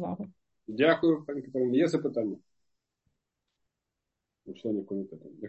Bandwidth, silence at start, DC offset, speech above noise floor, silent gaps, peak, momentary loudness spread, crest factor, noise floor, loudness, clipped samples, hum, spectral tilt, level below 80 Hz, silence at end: 8.4 kHz; 0 s; under 0.1%; 57 dB; none; -10 dBFS; 19 LU; 22 dB; -86 dBFS; -29 LUFS; under 0.1%; none; -7 dB/octave; -74 dBFS; 0 s